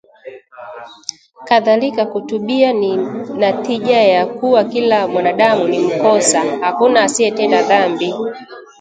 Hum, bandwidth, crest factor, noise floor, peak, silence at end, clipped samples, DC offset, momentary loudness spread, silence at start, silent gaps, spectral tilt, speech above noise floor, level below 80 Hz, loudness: none; 9.4 kHz; 14 dB; -36 dBFS; 0 dBFS; 0.2 s; under 0.1%; under 0.1%; 16 LU; 0.25 s; none; -3.5 dB/octave; 22 dB; -64 dBFS; -14 LUFS